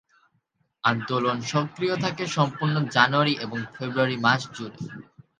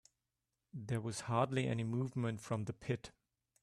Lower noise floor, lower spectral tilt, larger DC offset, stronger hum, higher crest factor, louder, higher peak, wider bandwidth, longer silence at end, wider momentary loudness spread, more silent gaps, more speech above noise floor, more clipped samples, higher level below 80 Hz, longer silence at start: second, -71 dBFS vs -89 dBFS; second, -5 dB/octave vs -6.5 dB/octave; neither; neither; about the same, 24 dB vs 20 dB; first, -24 LUFS vs -39 LUFS; first, -2 dBFS vs -20 dBFS; second, 9.4 kHz vs 12.5 kHz; second, 0.35 s vs 0.55 s; first, 16 LU vs 11 LU; neither; second, 47 dB vs 51 dB; neither; about the same, -66 dBFS vs -70 dBFS; about the same, 0.85 s vs 0.75 s